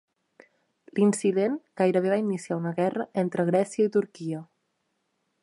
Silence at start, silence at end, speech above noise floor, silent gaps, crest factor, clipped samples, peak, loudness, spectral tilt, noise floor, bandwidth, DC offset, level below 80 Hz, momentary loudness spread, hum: 0.95 s; 1 s; 51 dB; none; 16 dB; under 0.1%; -10 dBFS; -26 LUFS; -6.5 dB/octave; -76 dBFS; 11.5 kHz; under 0.1%; -78 dBFS; 11 LU; none